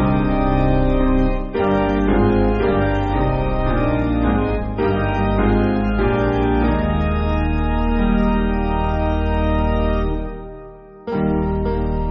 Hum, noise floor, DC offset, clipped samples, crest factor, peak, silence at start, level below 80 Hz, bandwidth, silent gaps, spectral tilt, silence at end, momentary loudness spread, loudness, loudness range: none; -38 dBFS; under 0.1%; under 0.1%; 14 dB; -4 dBFS; 0 s; -22 dBFS; 5.4 kHz; none; -7 dB/octave; 0 s; 4 LU; -19 LUFS; 3 LU